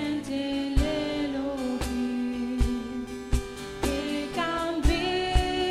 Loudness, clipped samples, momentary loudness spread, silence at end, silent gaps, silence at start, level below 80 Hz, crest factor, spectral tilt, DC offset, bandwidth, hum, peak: -29 LUFS; under 0.1%; 6 LU; 0 s; none; 0 s; -32 dBFS; 18 dB; -5.5 dB/octave; under 0.1%; 14.5 kHz; none; -10 dBFS